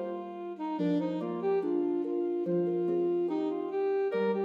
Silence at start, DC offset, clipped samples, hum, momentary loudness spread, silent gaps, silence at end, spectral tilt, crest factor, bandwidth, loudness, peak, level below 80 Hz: 0 s; under 0.1%; under 0.1%; none; 7 LU; none; 0 s; -9.5 dB/octave; 10 dB; 5.2 kHz; -31 LUFS; -20 dBFS; -88 dBFS